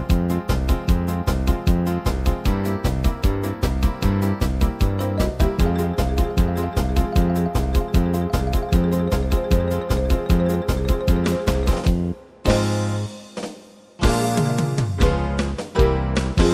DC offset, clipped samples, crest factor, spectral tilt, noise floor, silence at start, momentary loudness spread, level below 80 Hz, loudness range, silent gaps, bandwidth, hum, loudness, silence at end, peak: under 0.1%; under 0.1%; 18 dB; -6.5 dB/octave; -43 dBFS; 0 s; 3 LU; -24 dBFS; 2 LU; none; 16 kHz; none; -21 LUFS; 0 s; 0 dBFS